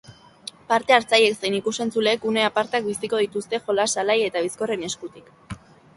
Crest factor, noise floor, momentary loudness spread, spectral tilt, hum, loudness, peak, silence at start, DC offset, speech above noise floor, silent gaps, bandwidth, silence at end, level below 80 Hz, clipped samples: 22 dB; -43 dBFS; 21 LU; -2.5 dB/octave; none; -22 LUFS; -2 dBFS; 0.1 s; under 0.1%; 21 dB; none; 11.5 kHz; 0.4 s; -62 dBFS; under 0.1%